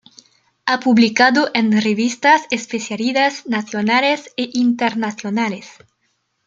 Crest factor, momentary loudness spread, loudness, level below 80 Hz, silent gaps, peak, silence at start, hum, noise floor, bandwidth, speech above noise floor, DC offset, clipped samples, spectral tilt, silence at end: 16 dB; 10 LU; -17 LUFS; -66 dBFS; none; 0 dBFS; 0.65 s; none; -68 dBFS; 7.8 kHz; 51 dB; under 0.1%; under 0.1%; -4 dB/octave; 0.75 s